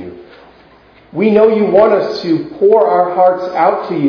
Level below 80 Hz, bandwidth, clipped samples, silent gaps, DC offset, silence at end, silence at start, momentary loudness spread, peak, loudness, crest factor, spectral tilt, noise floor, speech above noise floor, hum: -54 dBFS; 5.4 kHz; 0.2%; none; under 0.1%; 0 s; 0 s; 7 LU; 0 dBFS; -12 LUFS; 12 dB; -8 dB/octave; -44 dBFS; 33 dB; none